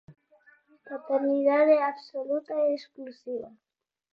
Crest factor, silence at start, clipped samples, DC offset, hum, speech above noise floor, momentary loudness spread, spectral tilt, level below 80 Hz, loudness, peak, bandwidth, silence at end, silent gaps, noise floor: 18 dB; 0.1 s; under 0.1%; under 0.1%; none; 35 dB; 20 LU; -6.5 dB/octave; -80 dBFS; -27 LUFS; -10 dBFS; 5.8 kHz; 0.65 s; none; -61 dBFS